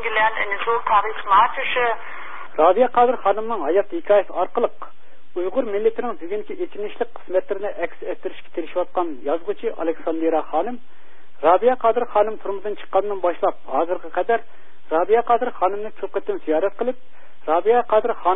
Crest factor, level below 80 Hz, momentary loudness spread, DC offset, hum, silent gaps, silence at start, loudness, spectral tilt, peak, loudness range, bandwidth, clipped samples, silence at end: 18 dB; -60 dBFS; 13 LU; 5%; none; none; 0 s; -21 LUFS; -9 dB/octave; -4 dBFS; 7 LU; 3.9 kHz; under 0.1%; 0 s